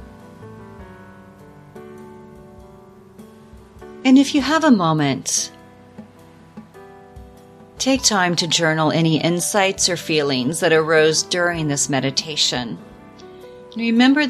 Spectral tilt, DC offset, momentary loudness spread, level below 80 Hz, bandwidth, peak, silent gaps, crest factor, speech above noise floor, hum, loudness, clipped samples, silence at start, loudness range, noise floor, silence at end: -3.5 dB/octave; under 0.1%; 24 LU; -52 dBFS; 14.5 kHz; -2 dBFS; none; 20 dB; 28 dB; none; -17 LUFS; under 0.1%; 0 s; 6 LU; -45 dBFS; 0 s